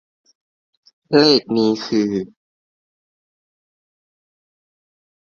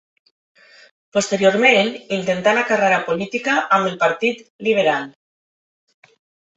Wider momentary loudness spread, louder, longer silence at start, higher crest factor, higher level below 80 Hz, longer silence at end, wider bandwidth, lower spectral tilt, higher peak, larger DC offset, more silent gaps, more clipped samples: about the same, 12 LU vs 10 LU; about the same, -17 LUFS vs -18 LUFS; about the same, 1.1 s vs 1.15 s; about the same, 22 dB vs 18 dB; about the same, -64 dBFS vs -64 dBFS; first, 3.15 s vs 1.45 s; second, 7.2 kHz vs 8.4 kHz; first, -5.5 dB/octave vs -4 dB/octave; about the same, 0 dBFS vs -2 dBFS; neither; second, none vs 4.50-4.59 s; neither